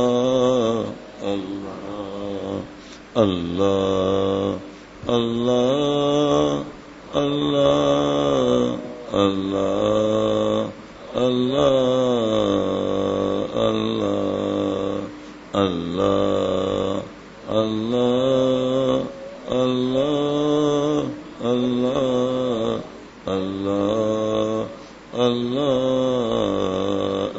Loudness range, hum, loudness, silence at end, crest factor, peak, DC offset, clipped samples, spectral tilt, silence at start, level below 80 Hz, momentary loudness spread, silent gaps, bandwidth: 3 LU; none; -21 LUFS; 0 s; 18 dB; -2 dBFS; under 0.1%; under 0.1%; -6 dB/octave; 0 s; -50 dBFS; 12 LU; none; 8 kHz